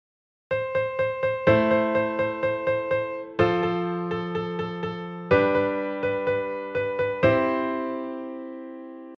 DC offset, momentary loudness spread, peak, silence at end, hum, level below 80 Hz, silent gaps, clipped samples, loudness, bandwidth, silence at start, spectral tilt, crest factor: under 0.1%; 12 LU; -6 dBFS; 0 s; none; -56 dBFS; none; under 0.1%; -25 LUFS; 6.2 kHz; 0.5 s; -8.5 dB/octave; 20 dB